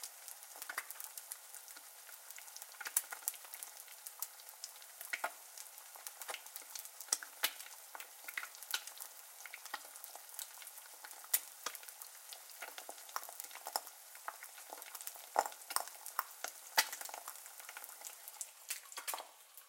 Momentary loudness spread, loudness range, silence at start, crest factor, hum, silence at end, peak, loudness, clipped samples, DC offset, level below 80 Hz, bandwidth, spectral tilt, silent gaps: 13 LU; 6 LU; 0 s; 36 dB; none; 0 s; -10 dBFS; -44 LUFS; under 0.1%; under 0.1%; under -90 dBFS; 17 kHz; 3.5 dB/octave; none